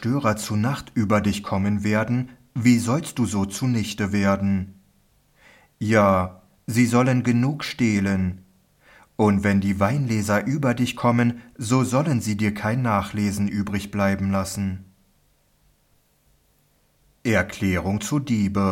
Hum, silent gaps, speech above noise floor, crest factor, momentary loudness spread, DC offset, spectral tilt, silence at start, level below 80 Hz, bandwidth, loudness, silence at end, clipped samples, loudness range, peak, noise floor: none; none; 42 dB; 18 dB; 8 LU; under 0.1%; -6 dB/octave; 0 s; -56 dBFS; 16.5 kHz; -22 LUFS; 0 s; under 0.1%; 7 LU; -4 dBFS; -63 dBFS